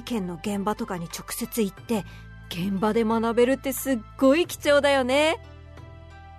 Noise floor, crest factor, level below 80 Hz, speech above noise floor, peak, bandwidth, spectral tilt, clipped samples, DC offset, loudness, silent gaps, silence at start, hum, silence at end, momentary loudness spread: -44 dBFS; 18 dB; -48 dBFS; 20 dB; -8 dBFS; 13.5 kHz; -4.5 dB/octave; under 0.1%; under 0.1%; -24 LUFS; none; 0 s; none; 0 s; 13 LU